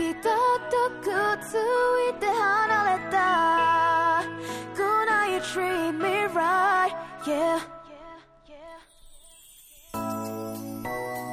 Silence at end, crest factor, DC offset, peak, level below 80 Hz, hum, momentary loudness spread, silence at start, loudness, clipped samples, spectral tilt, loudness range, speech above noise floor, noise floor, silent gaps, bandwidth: 0 s; 14 dB; under 0.1%; -12 dBFS; -60 dBFS; none; 13 LU; 0 s; -25 LUFS; under 0.1%; -4 dB/octave; 12 LU; 27 dB; -52 dBFS; none; 16.5 kHz